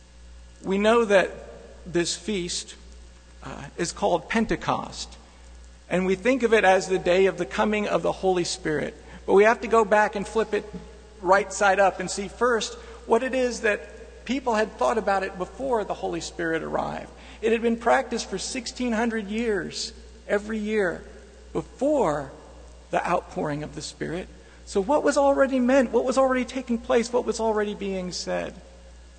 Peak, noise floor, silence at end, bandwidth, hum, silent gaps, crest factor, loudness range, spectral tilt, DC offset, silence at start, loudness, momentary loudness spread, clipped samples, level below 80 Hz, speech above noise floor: -6 dBFS; -47 dBFS; 0.1 s; 9.4 kHz; 60 Hz at -50 dBFS; none; 20 dB; 6 LU; -4.5 dB/octave; under 0.1%; 0.2 s; -24 LUFS; 15 LU; under 0.1%; -48 dBFS; 23 dB